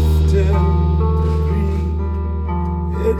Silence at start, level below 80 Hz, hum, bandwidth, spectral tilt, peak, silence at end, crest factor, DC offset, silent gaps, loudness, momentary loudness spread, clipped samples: 0 s; -18 dBFS; none; 7.6 kHz; -9 dB/octave; -4 dBFS; 0 s; 10 dB; under 0.1%; none; -18 LUFS; 6 LU; under 0.1%